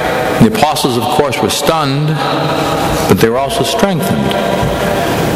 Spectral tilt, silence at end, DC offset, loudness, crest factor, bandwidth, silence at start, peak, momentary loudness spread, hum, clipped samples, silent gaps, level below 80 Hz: -5 dB/octave; 0 s; under 0.1%; -12 LUFS; 12 dB; 16.5 kHz; 0 s; 0 dBFS; 3 LU; none; 0.2%; none; -34 dBFS